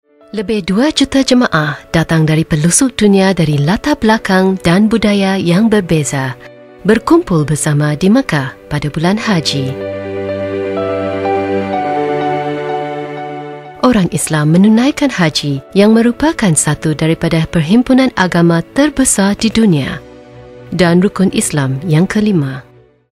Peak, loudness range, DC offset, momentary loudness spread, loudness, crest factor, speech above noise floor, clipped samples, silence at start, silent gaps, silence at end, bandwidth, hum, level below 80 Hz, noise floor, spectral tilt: 0 dBFS; 5 LU; under 0.1%; 10 LU; -12 LUFS; 12 dB; 23 dB; under 0.1%; 0.35 s; none; 0.5 s; 15.5 kHz; none; -38 dBFS; -35 dBFS; -5 dB/octave